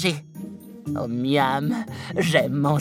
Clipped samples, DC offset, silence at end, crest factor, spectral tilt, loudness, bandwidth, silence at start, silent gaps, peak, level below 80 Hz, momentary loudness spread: under 0.1%; under 0.1%; 0 s; 20 dB; -5.5 dB/octave; -23 LUFS; 16.5 kHz; 0 s; none; -4 dBFS; -60 dBFS; 17 LU